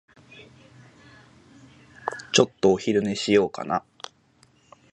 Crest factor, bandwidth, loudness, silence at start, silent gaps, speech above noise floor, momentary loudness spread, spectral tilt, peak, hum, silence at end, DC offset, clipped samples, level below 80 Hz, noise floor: 24 dB; 9.2 kHz; -23 LUFS; 0.4 s; none; 38 dB; 19 LU; -4 dB/octave; -2 dBFS; none; 1.15 s; under 0.1%; under 0.1%; -60 dBFS; -60 dBFS